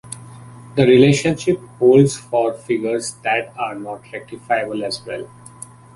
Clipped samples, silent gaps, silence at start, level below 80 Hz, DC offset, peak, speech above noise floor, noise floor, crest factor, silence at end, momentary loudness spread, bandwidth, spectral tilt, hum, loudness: under 0.1%; none; 0.05 s; -54 dBFS; under 0.1%; 0 dBFS; 23 dB; -40 dBFS; 18 dB; 0.7 s; 22 LU; 11.5 kHz; -5.5 dB/octave; none; -17 LUFS